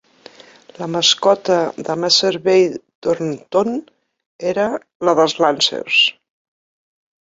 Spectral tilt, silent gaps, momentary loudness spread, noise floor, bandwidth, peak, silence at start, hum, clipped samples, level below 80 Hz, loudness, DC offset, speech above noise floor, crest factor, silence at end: -3 dB/octave; 2.95-3.02 s, 4.26-4.39 s, 4.95-5.00 s; 9 LU; -44 dBFS; 8 kHz; -2 dBFS; 0.8 s; none; under 0.1%; -62 dBFS; -16 LUFS; under 0.1%; 27 dB; 18 dB; 1.1 s